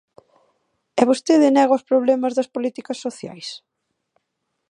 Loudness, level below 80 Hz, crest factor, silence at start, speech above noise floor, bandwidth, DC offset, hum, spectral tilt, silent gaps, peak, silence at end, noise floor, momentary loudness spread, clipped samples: -19 LUFS; -72 dBFS; 20 dB; 0.95 s; 58 dB; 11 kHz; under 0.1%; none; -4.5 dB/octave; none; 0 dBFS; 1.15 s; -76 dBFS; 18 LU; under 0.1%